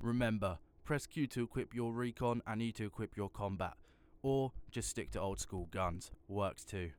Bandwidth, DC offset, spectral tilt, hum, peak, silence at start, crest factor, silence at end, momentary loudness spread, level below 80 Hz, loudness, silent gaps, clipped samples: 20 kHz; under 0.1%; -5.5 dB/octave; none; -24 dBFS; 0 s; 16 dB; 0.05 s; 7 LU; -56 dBFS; -40 LUFS; none; under 0.1%